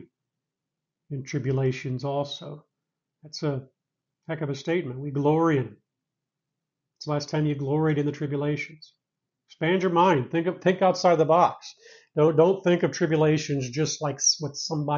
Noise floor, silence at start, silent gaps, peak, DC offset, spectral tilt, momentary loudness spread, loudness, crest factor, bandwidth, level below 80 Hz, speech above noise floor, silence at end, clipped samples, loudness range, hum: -86 dBFS; 0 s; none; -6 dBFS; under 0.1%; -5.5 dB/octave; 15 LU; -25 LUFS; 20 dB; 7.4 kHz; -66 dBFS; 62 dB; 0 s; under 0.1%; 9 LU; none